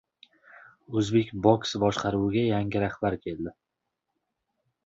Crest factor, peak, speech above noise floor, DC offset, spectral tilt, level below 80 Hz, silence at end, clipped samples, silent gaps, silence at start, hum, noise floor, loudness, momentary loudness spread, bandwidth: 22 dB; -6 dBFS; 57 dB; under 0.1%; -6.5 dB/octave; -54 dBFS; 1.35 s; under 0.1%; none; 0.9 s; none; -83 dBFS; -27 LUFS; 11 LU; 8 kHz